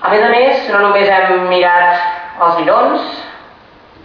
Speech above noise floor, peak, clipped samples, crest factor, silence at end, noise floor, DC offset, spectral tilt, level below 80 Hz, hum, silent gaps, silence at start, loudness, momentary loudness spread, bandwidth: 30 dB; 0 dBFS; under 0.1%; 12 dB; 0.65 s; -41 dBFS; under 0.1%; -6 dB/octave; -56 dBFS; none; none; 0 s; -11 LUFS; 10 LU; 5.4 kHz